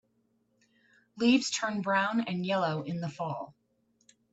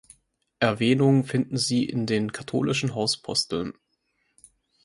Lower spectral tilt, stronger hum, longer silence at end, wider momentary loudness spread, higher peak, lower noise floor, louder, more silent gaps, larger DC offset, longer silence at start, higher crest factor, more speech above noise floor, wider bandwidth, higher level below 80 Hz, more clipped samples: about the same, -4.5 dB/octave vs -5 dB/octave; neither; second, 0.8 s vs 1.15 s; first, 11 LU vs 8 LU; second, -12 dBFS vs -6 dBFS; about the same, -73 dBFS vs -73 dBFS; second, -30 LUFS vs -24 LUFS; neither; neither; first, 1.15 s vs 0.6 s; about the same, 20 dB vs 20 dB; second, 44 dB vs 49 dB; second, 8.2 kHz vs 11.5 kHz; second, -76 dBFS vs -60 dBFS; neither